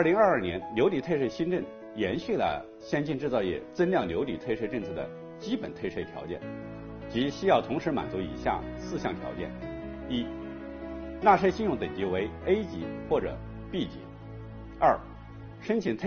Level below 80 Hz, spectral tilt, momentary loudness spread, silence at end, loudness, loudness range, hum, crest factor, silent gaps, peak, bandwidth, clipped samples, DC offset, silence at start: -50 dBFS; -5 dB/octave; 15 LU; 0 s; -30 LUFS; 5 LU; none; 22 dB; none; -8 dBFS; 6.8 kHz; under 0.1%; under 0.1%; 0 s